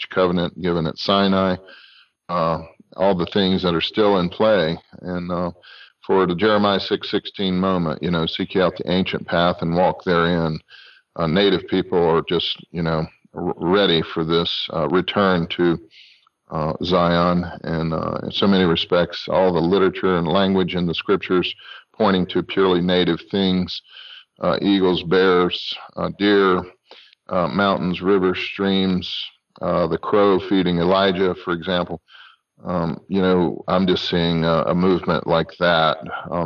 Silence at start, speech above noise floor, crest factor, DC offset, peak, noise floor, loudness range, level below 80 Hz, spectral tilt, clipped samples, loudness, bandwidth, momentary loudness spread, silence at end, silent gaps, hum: 0 s; 29 dB; 14 dB; under 0.1%; -6 dBFS; -49 dBFS; 2 LU; -52 dBFS; -7.5 dB/octave; under 0.1%; -20 LUFS; 6.4 kHz; 10 LU; 0 s; none; none